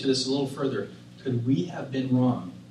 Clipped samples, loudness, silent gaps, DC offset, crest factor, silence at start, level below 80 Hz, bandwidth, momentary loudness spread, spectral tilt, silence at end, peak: under 0.1%; -27 LUFS; none; under 0.1%; 14 dB; 0 s; -64 dBFS; 11.5 kHz; 10 LU; -6 dB/octave; 0 s; -12 dBFS